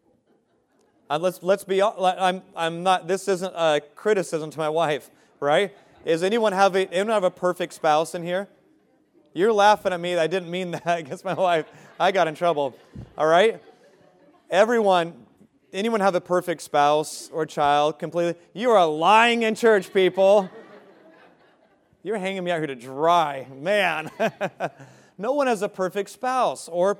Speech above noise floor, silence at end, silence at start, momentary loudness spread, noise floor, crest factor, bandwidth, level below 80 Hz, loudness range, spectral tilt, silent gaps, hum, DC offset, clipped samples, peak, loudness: 43 dB; 0.05 s; 1.1 s; 11 LU; -65 dBFS; 20 dB; 16 kHz; -68 dBFS; 5 LU; -4.5 dB/octave; none; none; under 0.1%; under 0.1%; -4 dBFS; -22 LUFS